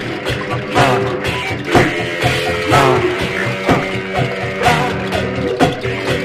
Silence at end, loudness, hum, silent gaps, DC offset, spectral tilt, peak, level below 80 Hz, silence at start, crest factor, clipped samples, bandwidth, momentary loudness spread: 0 s; -16 LUFS; none; none; under 0.1%; -5 dB/octave; 0 dBFS; -36 dBFS; 0 s; 16 dB; under 0.1%; 15.5 kHz; 6 LU